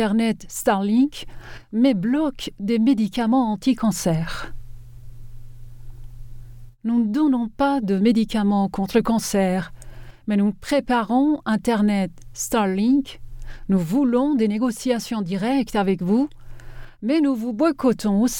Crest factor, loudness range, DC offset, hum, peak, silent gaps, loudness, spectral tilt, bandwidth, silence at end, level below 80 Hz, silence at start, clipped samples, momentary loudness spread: 16 dB; 4 LU; under 0.1%; none; -6 dBFS; none; -21 LUFS; -6 dB/octave; 18.5 kHz; 0 s; -42 dBFS; 0 s; under 0.1%; 10 LU